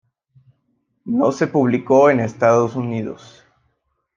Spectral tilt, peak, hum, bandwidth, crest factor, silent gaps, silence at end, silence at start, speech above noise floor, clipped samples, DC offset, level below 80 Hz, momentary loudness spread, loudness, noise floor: -7.5 dB/octave; -2 dBFS; none; 7.4 kHz; 18 dB; none; 1 s; 1.05 s; 52 dB; under 0.1%; under 0.1%; -62 dBFS; 16 LU; -17 LUFS; -69 dBFS